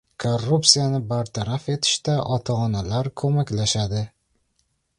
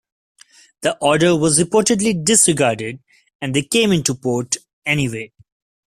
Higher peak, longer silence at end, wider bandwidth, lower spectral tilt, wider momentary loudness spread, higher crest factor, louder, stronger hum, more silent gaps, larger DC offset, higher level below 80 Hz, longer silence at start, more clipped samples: about the same, 0 dBFS vs 0 dBFS; first, 0.9 s vs 0.7 s; second, 11.5 kHz vs 15.5 kHz; about the same, -4.5 dB/octave vs -3.5 dB/octave; second, 11 LU vs 14 LU; about the same, 22 dB vs 18 dB; second, -22 LUFS vs -16 LUFS; neither; second, none vs 3.35-3.39 s, 4.73-4.82 s; neither; first, -48 dBFS vs -54 dBFS; second, 0.2 s vs 0.8 s; neither